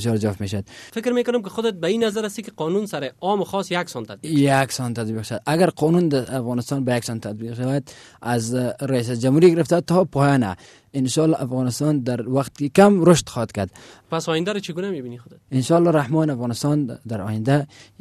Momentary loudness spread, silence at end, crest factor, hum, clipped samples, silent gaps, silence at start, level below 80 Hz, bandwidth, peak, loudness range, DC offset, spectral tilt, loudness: 12 LU; 0.2 s; 16 dB; none; under 0.1%; none; 0 s; -56 dBFS; 14 kHz; -4 dBFS; 4 LU; under 0.1%; -6 dB/octave; -21 LUFS